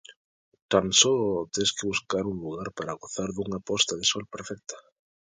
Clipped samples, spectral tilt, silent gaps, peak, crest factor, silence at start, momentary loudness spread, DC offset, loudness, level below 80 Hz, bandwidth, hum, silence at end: under 0.1%; -2.5 dB/octave; 0.16-0.52 s, 0.62-0.69 s; -4 dBFS; 24 dB; 0.1 s; 18 LU; under 0.1%; -26 LUFS; -58 dBFS; 10 kHz; none; 0.5 s